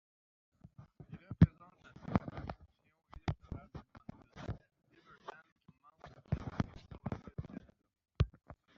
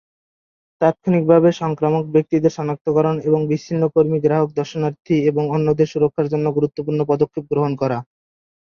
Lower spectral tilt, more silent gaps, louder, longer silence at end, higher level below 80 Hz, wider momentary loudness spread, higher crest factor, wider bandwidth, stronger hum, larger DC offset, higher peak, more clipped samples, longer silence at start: about the same, -8 dB/octave vs -8.5 dB/octave; about the same, 5.52-5.56 s vs 2.81-2.85 s; second, -39 LUFS vs -18 LUFS; second, 0.25 s vs 0.6 s; first, -52 dBFS vs -58 dBFS; first, 26 LU vs 6 LU; first, 28 dB vs 16 dB; about the same, 7 kHz vs 7 kHz; neither; neither; second, -12 dBFS vs -2 dBFS; neither; about the same, 0.8 s vs 0.8 s